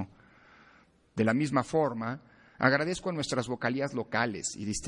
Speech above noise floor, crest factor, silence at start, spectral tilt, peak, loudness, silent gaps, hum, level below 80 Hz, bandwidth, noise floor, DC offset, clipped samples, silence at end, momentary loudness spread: 32 dB; 24 dB; 0 s; -5 dB/octave; -8 dBFS; -30 LUFS; none; none; -60 dBFS; 11.5 kHz; -62 dBFS; under 0.1%; under 0.1%; 0 s; 10 LU